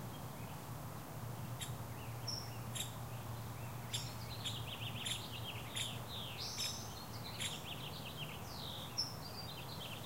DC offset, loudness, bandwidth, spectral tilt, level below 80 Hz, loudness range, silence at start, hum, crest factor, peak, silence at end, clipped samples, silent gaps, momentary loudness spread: 0.1%; -44 LUFS; 16 kHz; -3.5 dB/octave; -62 dBFS; 3 LU; 0 s; none; 20 dB; -26 dBFS; 0 s; under 0.1%; none; 7 LU